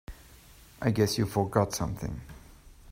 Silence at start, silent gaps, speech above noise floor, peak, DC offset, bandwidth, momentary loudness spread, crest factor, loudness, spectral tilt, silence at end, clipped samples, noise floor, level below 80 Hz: 0.1 s; none; 25 dB; -10 dBFS; under 0.1%; 16 kHz; 18 LU; 22 dB; -29 LUFS; -5.5 dB/octave; 0 s; under 0.1%; -54 dBFS; -50 dBFS